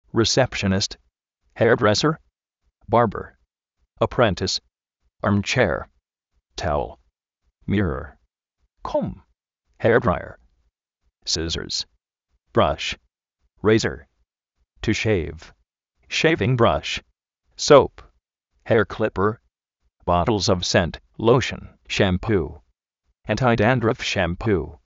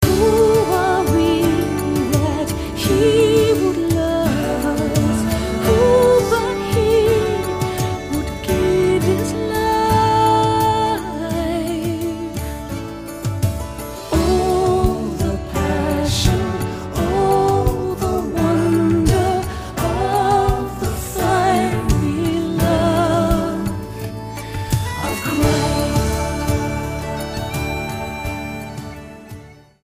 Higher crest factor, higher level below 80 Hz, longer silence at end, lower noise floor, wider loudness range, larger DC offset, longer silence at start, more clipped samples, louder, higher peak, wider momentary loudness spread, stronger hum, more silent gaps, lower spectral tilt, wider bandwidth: first, 22 dB vs 16 dB; second, -42 dBFS vs -30 dBFS; second, 0.15 s vs 0.3 s; first, -73 dBFS vs -39 dBFS; about the same, 6 LU vs 5 LU; neither; first, 0.15 s vs 0 s; neither; second, -21 LUFS vs -18 LUFS; about the same, 0 dBFS vs 0 dBFS; first, 15 LU vs 11 LU; neither; neither; second, -4 dB/octave vs -6 dB/octave; second, 8 kHz vs 15.5 kHz